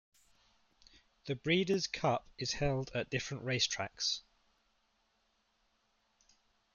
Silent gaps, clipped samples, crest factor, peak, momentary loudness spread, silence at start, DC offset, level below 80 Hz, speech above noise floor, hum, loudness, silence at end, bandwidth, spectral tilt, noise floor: none; under 0.1%; 20 dB; -18 dBFS; 8 LU; 1.25 s; under 0.1%; -60 dBFS; 42 dB; none; -35 LUFS; 2.55 s; 7.8 kHz; -4 dB/octave; -77 dBFS